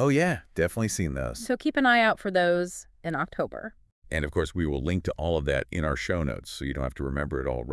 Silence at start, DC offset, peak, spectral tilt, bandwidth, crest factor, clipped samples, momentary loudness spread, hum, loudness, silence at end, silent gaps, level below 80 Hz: 0 s; under 0.1%; -10 dBFS; -5.5 dB/octave; 12 kHz; 18 dB; under 0.1%; 11 LU; none; -27 LUFS; 0 s; 3.92-4.02 s; -42 dBFS